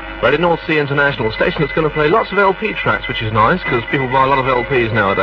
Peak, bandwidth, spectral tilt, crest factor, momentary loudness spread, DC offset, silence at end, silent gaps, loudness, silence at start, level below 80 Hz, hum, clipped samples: 0 dBFS; 6.6 kHz; -8 dB/octave; 14 dB; 4 LU; under 0.1%; 0 s; none; -15 LUFS; 0 s; -36 dBFS; none; under 0.1%